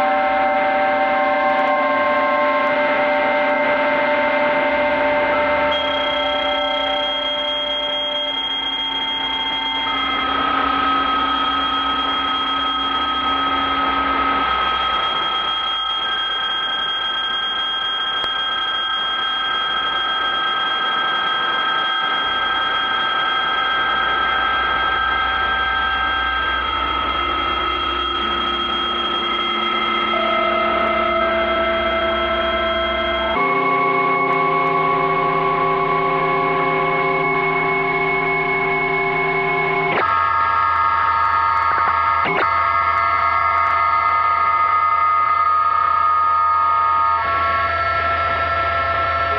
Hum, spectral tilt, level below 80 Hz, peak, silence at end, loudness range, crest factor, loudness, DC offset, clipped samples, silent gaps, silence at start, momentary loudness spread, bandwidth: none; -5 dB/octave; -42 dBFS; -6 dBFS; 0 s; 3 LU; 12 dB; -17 LUFS; under 0.1%; under 0.1%; none; 0 s; 3 LU; 7 kHz